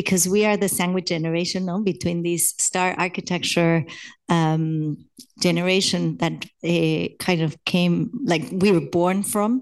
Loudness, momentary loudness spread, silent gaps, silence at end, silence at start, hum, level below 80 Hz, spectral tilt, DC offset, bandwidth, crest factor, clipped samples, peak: -21 LUFS; 6 LU; none; 0 s; 0 s; none; -60 dBFS; -4.5 dB/octave; under 0.1%; 12.5 kHz; 18 dB; under 0.1%; -4 dBFS